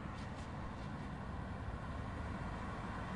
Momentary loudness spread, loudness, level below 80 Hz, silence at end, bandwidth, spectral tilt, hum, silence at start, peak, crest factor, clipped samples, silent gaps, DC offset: 2 LU; -46 LUFS; -50 dBFS; 0 s; 11 kHz; -7 dB/octave; none; 0 s; -32 dBFS; 12 dB; under 0.1%; none; under 0.1%